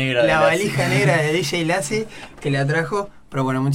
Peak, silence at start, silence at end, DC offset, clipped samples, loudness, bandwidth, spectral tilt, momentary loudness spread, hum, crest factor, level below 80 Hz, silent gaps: -4 dBFS; 0 s; 0 s; under 0.1%; under 0.1%; -19 LUFS; 16 kHz; -5 dB/octave; 10 LU; none; 16 dB; -48 dBFS; none